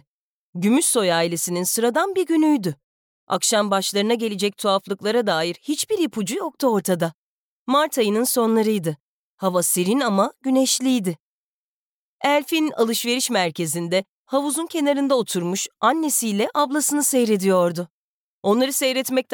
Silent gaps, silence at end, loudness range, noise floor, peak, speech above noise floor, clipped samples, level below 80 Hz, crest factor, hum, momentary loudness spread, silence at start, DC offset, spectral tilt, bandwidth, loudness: 2.84-3.27 s, 7.14-7.66 s, 9.00-9.38 s, 11.20-12.19 s, 14.09-14.25 s, 17.90-18.43 s; 0 s; 2 LU; under -90 dBFS; -8 dBFS; over 70 dB; under 0.1%; -78 dBFS; 14 dB; none; 7 LU; 0.55 s; under 0.1%; -3.5 dB/octave; 19.5 kHz; -21 LUFS